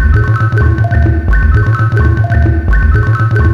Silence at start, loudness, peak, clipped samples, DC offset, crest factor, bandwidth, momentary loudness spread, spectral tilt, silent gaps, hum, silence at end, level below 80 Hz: 0 s; -11 LUFS; 0 dBFS; under 0.1%; under 0.1%; 8 dB; 5.6 kHz; 1 LU; -9 dB/octave; none; none; 0 s; -12 dBFS